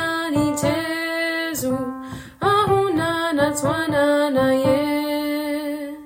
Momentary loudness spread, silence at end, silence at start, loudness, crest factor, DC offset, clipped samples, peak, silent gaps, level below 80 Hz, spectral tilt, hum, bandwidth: 8 LU; 0 s; 0 s; -21 LUFS; 14 dB; under 0.1%; under 0.1%; -6 dBFS; none; -52 dBFS; -4.5 dB/octave; none; 16.5 kHz